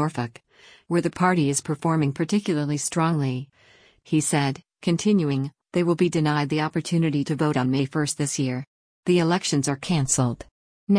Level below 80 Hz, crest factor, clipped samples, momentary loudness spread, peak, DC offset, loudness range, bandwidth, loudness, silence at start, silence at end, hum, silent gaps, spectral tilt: -58 dBFS; 16 dB; under 0.1%; 7 LU; -8 dBFS; under 0.1%; 1 LU; 10.5 kHz; -24 LUFS; 0 s; 0 s; none; 8.67-9.03 s, 10.51-10.87 s; -5.5 dB/octave